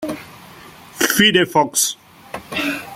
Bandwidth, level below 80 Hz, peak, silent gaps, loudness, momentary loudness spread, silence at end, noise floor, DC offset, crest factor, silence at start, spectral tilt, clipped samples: 16.5 kHz; -56 dBFS; -2 dBFS; none; -16 LUFS; 22 LU; 0 s; -41 dBFS; under 0.1%; 18 dB; 0 s; -2 dB/octave; under 0.1%